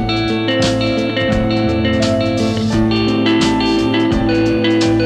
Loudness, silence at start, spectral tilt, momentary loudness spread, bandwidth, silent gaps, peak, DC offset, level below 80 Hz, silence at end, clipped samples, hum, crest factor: -15 LUFS; 0 s; -6 dB/octave; 3 LU; 10.5 kHz; none; -4 dBFS; under 0.1%; -32 dBFS; 0 s; under 0.1%; none; 12 dB